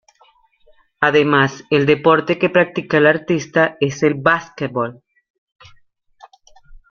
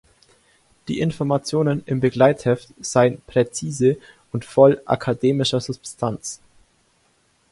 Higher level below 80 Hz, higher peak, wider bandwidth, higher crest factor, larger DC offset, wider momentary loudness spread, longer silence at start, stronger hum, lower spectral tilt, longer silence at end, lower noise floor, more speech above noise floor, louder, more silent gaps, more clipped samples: about the same, -54 dBFS vs -54 dBFS; about the same, -2 dBFS vs 0 dBFS; second, 7 kHz vs 11.5 kHz; about the same, 18 dB vs 20 dB; neither; second, 9 LU vs 16 LU; first, 1 s vs 0.85 s; neither; about the same, -6 dB/octave vs -5.5 dB/octave; second, 0.15 s vs 1.15 s; second, -55 dBFS vs -62 dBFS; second, 39 dB vs 43 dB; first, -16 LUFS vs -20 LUFS; first, 5.30-5.47 s vs none; neither